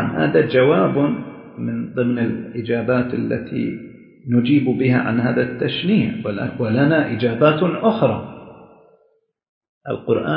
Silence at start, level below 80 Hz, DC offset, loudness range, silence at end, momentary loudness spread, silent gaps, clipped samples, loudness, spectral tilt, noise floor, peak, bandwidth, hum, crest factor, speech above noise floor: 0 s; -54 dBFS; under 0.1%; 3 LU; 0 s; 12 LU; 9.49-9.61 s, 9.69-9.81 s; under 0.1%; -19 LUFS; -12 dB/octave; -62 dBFS; -2 dBFS; 5.2 kHz; none; 18 dB; 44 dB